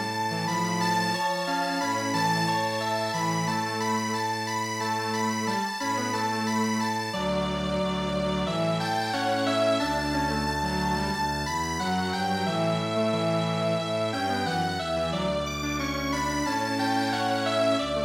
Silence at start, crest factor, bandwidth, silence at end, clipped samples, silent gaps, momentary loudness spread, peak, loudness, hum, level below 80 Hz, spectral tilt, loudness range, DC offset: 0 s; 14 dB; 16.5 kHz; 0 s; under 0.1%; none; 3 LU; -12 dBFS; -27 LUFS; none; -48 dBFS; -4.5 dB/octave; 1 LU; under 0.1%